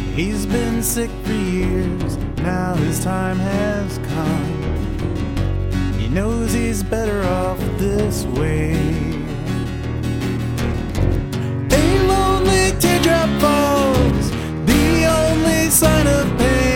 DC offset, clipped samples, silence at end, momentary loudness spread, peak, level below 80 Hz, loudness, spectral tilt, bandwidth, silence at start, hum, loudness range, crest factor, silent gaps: under 0.1%; under 0.1%; 0 s; 8 LU; -2 dBFS; -26 dBFS; -18 LUFS; -5 dB/octave; 17 kHz; 0 s; none; 6 LU; 16 dB; none